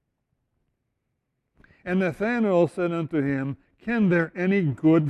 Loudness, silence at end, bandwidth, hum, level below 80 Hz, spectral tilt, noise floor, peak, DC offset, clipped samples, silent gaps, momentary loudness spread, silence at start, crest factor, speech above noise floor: -24 LUFS; 0 s; 10.5 kHz; none; -60 dBFS; -9 dB/octave; -78 dBFS; -8 dBFS; under 0.1%; under 0.1%; none; 8 LU; 1.85 s; 16 dB; 55 dB